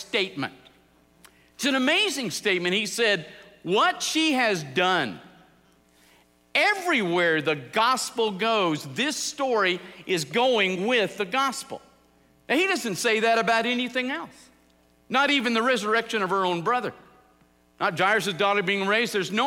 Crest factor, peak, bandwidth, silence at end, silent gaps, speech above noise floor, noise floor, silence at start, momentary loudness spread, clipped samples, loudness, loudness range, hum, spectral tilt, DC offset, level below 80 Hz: 18 dB; -8 dBFS; 16 kHz; 0 s; none; 36 dB; -61 dBFS; 0 s; 7 LU; under 0.1%; -24 LUFS; 2 LU; none; -3 dB/octave; under 0.1%; -68 dBFS